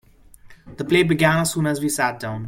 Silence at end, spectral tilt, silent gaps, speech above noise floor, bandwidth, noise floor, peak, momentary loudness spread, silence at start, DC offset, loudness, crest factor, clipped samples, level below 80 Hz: 0 s; -5 dB/octave; none; 27 dB; 16.5 kHz; -47 dBFS; -4 dBFS; 6 LU; 0.45 s; under 0.1%; -19 LUFS; 16 dB; under 0.1%; -50 dBFS